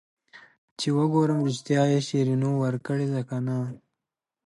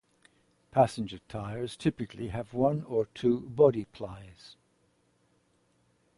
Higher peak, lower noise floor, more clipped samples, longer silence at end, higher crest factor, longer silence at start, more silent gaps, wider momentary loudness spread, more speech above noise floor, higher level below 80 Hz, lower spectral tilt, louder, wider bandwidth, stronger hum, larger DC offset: about the same, -10 dBFS vs -10 dBFS; first, -88 dBFS vs -70 dBFS; neither; second, 0.7 s vs 1.7 s; second, 16 dB vs 22 dB; second, 0.35 s vs 0.75 s; first, 0.58-0.76 s vs none; second, 7 LU vs 17 LU; first, 64 dB vs 41 dB; second, -72 dBFS vs -58 dBFS; about the same, -7 dB/octave vs -7.5 dB/octave; first, -26 LUFS vs -30 LUFS; about the same, 11.5 kHz vs 11.5 kHz; neither; neither